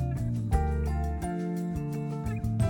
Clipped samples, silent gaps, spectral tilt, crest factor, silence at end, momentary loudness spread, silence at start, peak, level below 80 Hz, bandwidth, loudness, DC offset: under 0.1%; none; -8 dB/octave; 16 dB; 0 s; 4 LU; 0 s; -12 dBFS; -34 dBFS; 17.5 kHz; -31 LUFS; under 0.1%